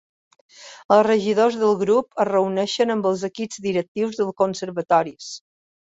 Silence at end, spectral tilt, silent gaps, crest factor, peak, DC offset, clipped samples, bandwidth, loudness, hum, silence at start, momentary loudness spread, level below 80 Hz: 0.55 s; -5 dB/octave; 0.85-0.89 s, 3.88-3.95 s; 18 dB; -4 dBFS; under 0.1%; under 0.1%; 8 kHz; -21 LUFS; none; 0.6 s; 13 LU; -66 dBFS